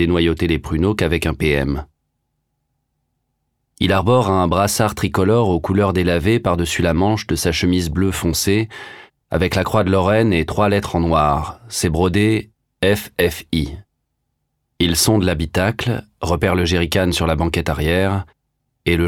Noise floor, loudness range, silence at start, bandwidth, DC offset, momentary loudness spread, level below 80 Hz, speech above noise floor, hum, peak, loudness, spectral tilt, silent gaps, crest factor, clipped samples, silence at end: -72 dBFS; 4 LU; 0 s; 17.5 kHz; under 0.1%; 7 LU; -34 dBFS; 55 dB; none; -4 dBFS; -18 LUFS; -5.5 dB/octave; none; 14 dB; under 0.1%; 0 s